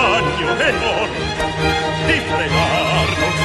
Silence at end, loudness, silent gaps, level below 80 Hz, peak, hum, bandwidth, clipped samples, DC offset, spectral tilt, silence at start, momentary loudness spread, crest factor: 0 s; -17 LUFS; none; -32 dBFS; -4 dBFS; none; 12.5 kHz; under 0.1%; under 0.1%; -4.5 dB/octave; 0 s; 4 LU; 14 dB